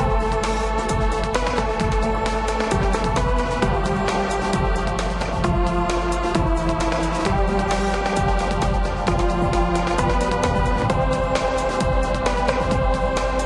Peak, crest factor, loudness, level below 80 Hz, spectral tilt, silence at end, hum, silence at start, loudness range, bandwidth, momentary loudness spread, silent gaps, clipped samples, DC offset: -2 dBFS; 18 dB; -21 LUFS; -26 dBFS; -5.5 dB/octave; 0 s; none; 0 s; 1 LU; 11.5 kHz; 2 LU; none; under 0.1%; under 0.1%